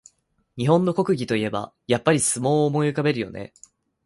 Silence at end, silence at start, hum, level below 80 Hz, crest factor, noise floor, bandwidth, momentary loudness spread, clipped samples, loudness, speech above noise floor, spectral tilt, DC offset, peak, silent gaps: 0.6 s; 0.55 s; none; -58 dBFS; 20 dB; -66 dBFS; 11.5 kHz; 13 LU; under 0.1%; -22 LUFS; 44 dB; -5 dB/octave; under 0.1%; -4 dBFS; none